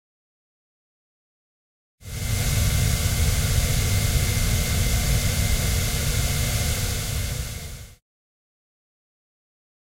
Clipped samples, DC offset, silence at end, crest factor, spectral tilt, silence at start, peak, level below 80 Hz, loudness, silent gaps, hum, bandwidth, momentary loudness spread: under 0.1%; under 0.1%; 2.05 s; 16 dB; -3.5 dB/octave; 2 s; -10 dBFS; -30 dBFS; -23 LUFS; none; none; 16.5 kHz; 9 LU